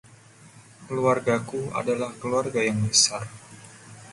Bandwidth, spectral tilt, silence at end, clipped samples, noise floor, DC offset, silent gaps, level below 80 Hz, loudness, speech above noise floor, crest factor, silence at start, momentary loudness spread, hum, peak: 11.5 kHz; -3 dB/octave; 0 s; under 0.1%; -51 dBFS; under 0.1%; none; -60 dBFS; -24 LUFS; 26 dB; 22 dB; 0.1 s; 26 LU; none; -4 dBFS